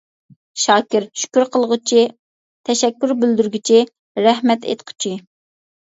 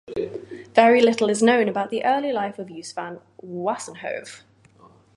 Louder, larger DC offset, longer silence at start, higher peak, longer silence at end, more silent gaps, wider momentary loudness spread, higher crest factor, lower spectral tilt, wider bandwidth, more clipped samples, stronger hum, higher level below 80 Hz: first, -17 LUFS vs -21 LUFS; neither; first, 0.55 s vs 0.1 s; about the same, 0 dBFS vs 0 dBFS; second, 0.65 s vs 0.8 s; first, 2.19-2.64 s, 3.99-4.15 s vs none; second, 10 LU vs 20 LU; about the same, 18 dB vs 22 dB; second, -3 dB/octave vs -4.5 dB/octave; second, 8 kHz vs 11.5 kHz; neither; neither; about the same, -70 dBFS vs -66 dBFS